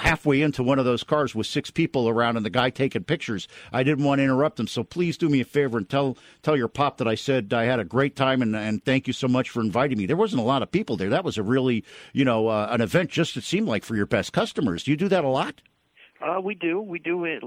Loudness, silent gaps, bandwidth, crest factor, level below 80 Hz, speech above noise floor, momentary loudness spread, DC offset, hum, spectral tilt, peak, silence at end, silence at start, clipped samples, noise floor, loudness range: -24 LUFS; none; 15.5 kHz; 16 dB; -52 dBFS; 33 dB; 5 LU; under 0.1%; none; -6 dB/octave; -8 dBFS; 0 s; 0 s; under 0.1%; -57 dBFS; 1 LU